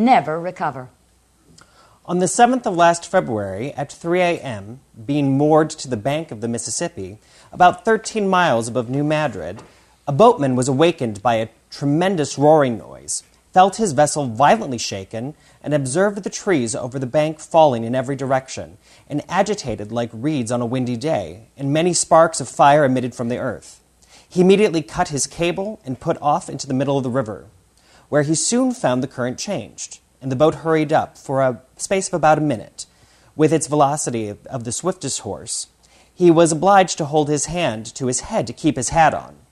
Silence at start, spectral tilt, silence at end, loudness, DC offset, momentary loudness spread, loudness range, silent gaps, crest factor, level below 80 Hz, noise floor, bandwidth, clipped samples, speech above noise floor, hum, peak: 0 s; -5 dB/octave; 0.2 s; -19 LUFS; under 0.1%; 14 LU; 4 LU; none; 18 dB; -52 dBFS; -57 dBFS; 13 kHz; under 0.1%; 38 dB; none; 0 dBFS